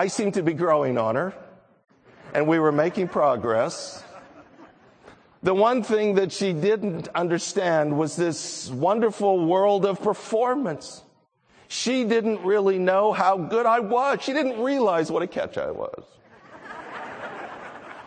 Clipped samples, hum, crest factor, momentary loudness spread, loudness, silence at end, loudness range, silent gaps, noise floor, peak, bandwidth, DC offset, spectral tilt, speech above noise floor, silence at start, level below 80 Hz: under 0.1%; none; 18 dB; 15 LU; -23 LUFS; 0 s; 3 LU; none; -61 dBFS; -6 dBFS; 9.4 kHz; under 0.1%; -5 dB/octave; 39 dB; 0 s; -68 dBFS